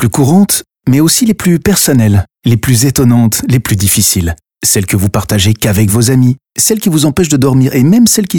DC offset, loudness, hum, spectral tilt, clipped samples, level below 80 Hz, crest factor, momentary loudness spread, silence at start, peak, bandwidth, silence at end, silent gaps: 1%; -9 LUFS; none; -5 dB/octave; under 0.1%; -34 dBFS; 10 dB; 5 LU; 0 s; 0 dBFS; over 20 kHz; 0 s; none